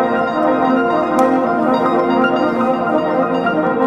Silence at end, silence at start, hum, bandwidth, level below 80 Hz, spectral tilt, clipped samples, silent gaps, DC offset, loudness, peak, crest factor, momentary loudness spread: 0 s; 0 s; none; 12 kHz; -52 dBFS; -7 dB/octave; under 0.1%; none; under 0.1%; -15 LUFS; -2 dBFS; 14 dB; 2 LU